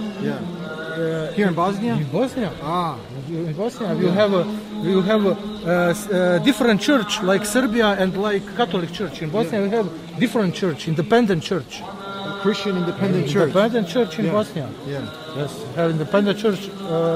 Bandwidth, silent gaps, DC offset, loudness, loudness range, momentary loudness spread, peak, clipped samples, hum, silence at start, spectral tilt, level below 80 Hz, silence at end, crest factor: 16 kHz; none; under 0.1%; -21 LUFS; 4 LU; 11 LU; -6 dBFS; under 0.1%; none; 0 s; -6 dB/octave; -54 dBFS; 0 s; 16 dB